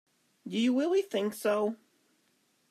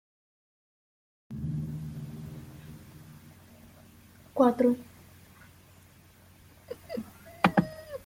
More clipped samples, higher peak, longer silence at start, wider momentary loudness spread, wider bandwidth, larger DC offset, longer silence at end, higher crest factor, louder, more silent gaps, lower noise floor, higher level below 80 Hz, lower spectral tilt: neither; second, -18 dBFS vs -6 dBFS; second, 0.45 s vs 1.3 s; second, 14 LU vs 25 LU; about the same, 15 kHz vs 16.5 kHz; neither; first, 0.95 s vs 0.05 s; second, 14 dB vs 28 dB; about the same, -30 LUFS vs -30 LUFS; neither; first, -72 dBFS vs -57 dBFS; second, -90 dBFS vs -60 dBFS; second, -5 dB/octave vs -7.5 dB/octave